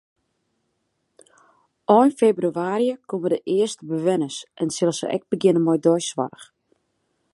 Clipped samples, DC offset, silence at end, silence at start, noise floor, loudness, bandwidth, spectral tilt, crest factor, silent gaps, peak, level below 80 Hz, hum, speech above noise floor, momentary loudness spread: under 0.1%; under 0.1%; 0.9 s; 1.9 s; -73 dBFS; -21 LUFS; 11.5 kHz; -5.5 dB/octave; 20 dB; none; -2 dBFS; -72 dBFS; none; 52 dB; 10 LU